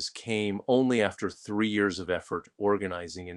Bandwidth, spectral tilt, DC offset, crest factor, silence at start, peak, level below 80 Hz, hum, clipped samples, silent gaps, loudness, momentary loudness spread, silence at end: 11 kHz; -5 dB/octave; under 0.1%; 20 dB; 0 s; -10 dBFS; -62 dBFS; none; under 0.1%; none; -29 LUFS; 10 LU; 0 s